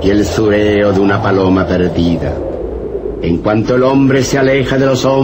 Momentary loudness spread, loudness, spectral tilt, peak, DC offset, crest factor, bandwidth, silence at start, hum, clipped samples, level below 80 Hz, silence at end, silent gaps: 9 LU; -12 LUFS; -6.5 dB/octave; 0 dBFS; under 0.1%; 10 dB; 16 kHz; 0 s; none; under 0.1%; -30 dBFS; 0 s; none